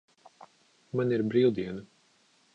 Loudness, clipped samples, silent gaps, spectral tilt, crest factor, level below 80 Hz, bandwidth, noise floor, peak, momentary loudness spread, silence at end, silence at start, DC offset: -28 LUFS; under 0.1%; none; -8.5 dB/octave; 18 dB; -68 dBFS; 7.6 kHz; -66 dBFS; -14 dBFS; 13 LU; 0.7 s; 0.4 s; under 0.1%